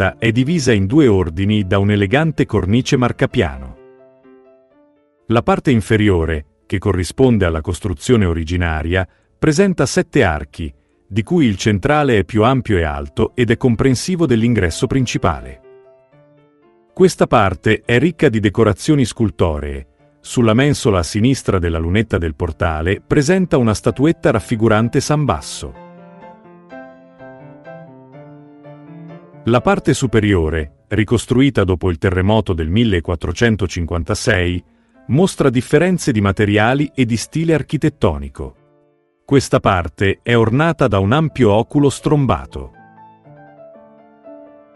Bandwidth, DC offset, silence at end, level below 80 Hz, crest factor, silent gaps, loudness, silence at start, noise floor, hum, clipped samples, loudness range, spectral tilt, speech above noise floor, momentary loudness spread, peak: 12 kHz; under 0.1%; 0.3 s; -34 dBFS; 16 dB; none; -16 LUFS; 0 s; -58 dBFS; none; under 0.1%; 4 LU; -6 dB/octave; 43 dB; 10 LU; 0 dBFS